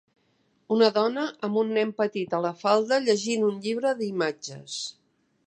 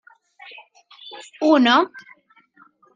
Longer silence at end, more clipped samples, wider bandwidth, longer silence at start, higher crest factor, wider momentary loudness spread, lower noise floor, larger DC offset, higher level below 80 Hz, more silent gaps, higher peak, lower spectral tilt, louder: second, 0.55 s vs 0.95 s; neither; about the same, 9.6 kHz vs 9.2 kHz; second, 0.7 s vs 1.05 s; about the same, 20 dB vs 20 dB; second, 12 LU vs 27 LU; first, -68 dBFS vs -55 dBFS; neither; about the same, -80 dBFS vs -76 dBFS; neither; second, -6 dBFS vs -2 dBFS; about the same, -4 dB/octave vs -3.5 dB/octave; second, -26 LUFS vs -17 LUFS